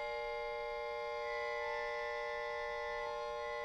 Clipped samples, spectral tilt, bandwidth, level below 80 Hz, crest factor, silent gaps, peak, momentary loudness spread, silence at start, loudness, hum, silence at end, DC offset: under 0.1%; -2 dB/octave; 15 kHz; -62 dBFS; 12 dB; none; -28 dBFS; 2 LU; 0 s; -40 LUFS; none; 0 s; under 0.1%